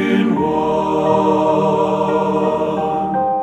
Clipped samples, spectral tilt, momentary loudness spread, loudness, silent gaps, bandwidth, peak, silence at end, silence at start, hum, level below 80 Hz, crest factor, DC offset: under 0.1%; -7.5 dB/octave; 4 LU; -16 LUFS; none; 9.2 kHz; -2 dBFS; 0 s; 0 s; none; -48 dBFS; 14 dB; under 0.1%